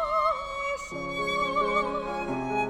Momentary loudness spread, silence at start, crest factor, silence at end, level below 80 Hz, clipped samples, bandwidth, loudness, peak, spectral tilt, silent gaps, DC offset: 6 LU; 0 s; 16 dB; 0 s; -50 dBFS; under 0.1%; 15.5 kHz; -28 LUFS; -14 dBFS; -4.5 dB/octave; none; under 0.1%